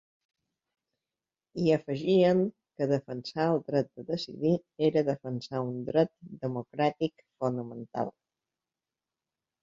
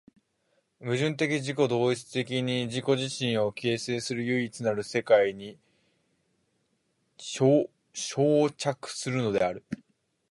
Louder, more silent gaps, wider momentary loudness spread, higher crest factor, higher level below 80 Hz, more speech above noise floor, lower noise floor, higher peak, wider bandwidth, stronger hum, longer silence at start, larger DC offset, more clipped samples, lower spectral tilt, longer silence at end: about the same, -30 LUFS vs -28 LUFS; neither; second, 10 LU vs 13 LU; about the same, 20 dB vs 20 dB; about the same, -70 dBFS vs -68 dBFS; first, over 61 dB vs 47 dB; first, under -90 dBFS vs -74 dBFS; about the same, -10 dBFS vs -8 dBFS; second, 7.6 kHz vs 11.5 kHz; neither; first, 1.55 s vs 0.8 s; neither; neither; first, -7.5 dB/octave vs -5 dB/octave; first, 1.5 s vs 0.55 s